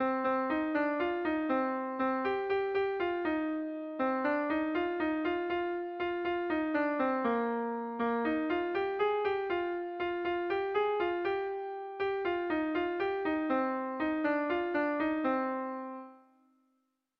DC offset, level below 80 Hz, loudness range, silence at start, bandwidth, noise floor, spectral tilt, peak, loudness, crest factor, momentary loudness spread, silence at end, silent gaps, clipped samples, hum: under 0.1%; -66 dBFS; 1 LU; 0 s; 5.6 kHz; -79 dBFS; -7 dB/octave; -18 dBFS; -33 LUFS; 14 dB; 5 LU; 1 s; none; under 0.1%; none